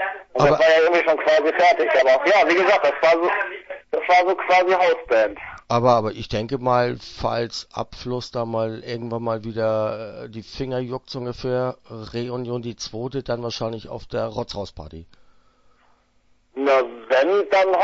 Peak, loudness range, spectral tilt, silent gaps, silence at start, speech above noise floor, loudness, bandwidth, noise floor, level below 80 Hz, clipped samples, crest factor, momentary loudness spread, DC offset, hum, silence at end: -4 dBFS; 12 LU; -5.5 dB/octave; none; 0 s; 40 dB; -20 LUFS; 7.8 kHz; -60 dBFS; -50 dBFS; under 0.1%; 18 dB; 15 LU; under 0.1%; none; 0 s